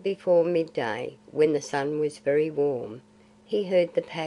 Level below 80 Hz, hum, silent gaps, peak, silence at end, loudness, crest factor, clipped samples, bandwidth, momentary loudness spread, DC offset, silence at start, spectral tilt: -72 dBFS; none; none; -10 dBFS; 0 s; -26 LUFS; 16 dB; under 0.1%; 11 kHz; 11 LU; under 0.1%; 0 s; -6 dB/octave